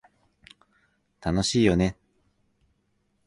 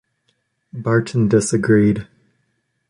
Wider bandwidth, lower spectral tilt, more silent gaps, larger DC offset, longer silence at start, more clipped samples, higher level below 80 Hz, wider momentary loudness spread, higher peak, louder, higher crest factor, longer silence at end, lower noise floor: about the same, 11.5 kHz vs 11.5 kHz; about the same, -5.5 dB/octave vs -6.5 dB/octave; neither; neither; first, 1.2 s vs 0.75 s; neither; about the same, -46 dBFS vs -50 dBFS; second, 8 LU vs 12 LU; second, -8 dBFS vs -2 dBFS; second, -24 LUFS vs -17 LUFS; first, 22 dB vs 16 dB; first, 1.35 s vs 0.85 s; about the same, -71 dBFS vs -69 dBFS